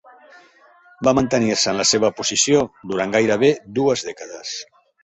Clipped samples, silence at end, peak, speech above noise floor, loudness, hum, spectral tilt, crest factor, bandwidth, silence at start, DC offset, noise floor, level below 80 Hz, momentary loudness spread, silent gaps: under 0.1%; 0.4 s; -2 dBFS; 32 dB; -18 LUFS; none; -3 dB/octave; 18 dB; 8.4 kHz; 1 s; under 0.1%; -51 dBFS; -54 dBFS; 13 LU; none